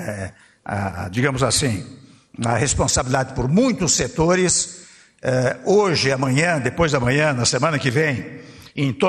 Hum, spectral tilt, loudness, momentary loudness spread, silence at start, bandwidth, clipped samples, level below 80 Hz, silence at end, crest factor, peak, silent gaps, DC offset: none; -4 dB/octave; -19 LUFS; 12 LU; 0 s; 13 kHz; under 0.1%; -42 dBFS; 0 s; 16 dB; -4 dBFS; none; under 0.1%